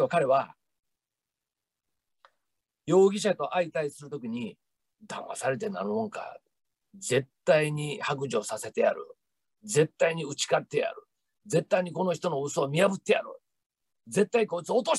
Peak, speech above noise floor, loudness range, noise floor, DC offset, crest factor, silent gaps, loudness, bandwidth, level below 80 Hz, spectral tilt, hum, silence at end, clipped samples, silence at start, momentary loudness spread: -10 dBFS; 62 dB; 5 LU; -89 dBFS; under 0.1%; 20 dB; 13.66-13.70 s; -28 LUFS; 12.5 kHz; -76 dBFS; -4.5 dB/octave; none; 0 s; under 0.1%; 0 s; 15 LU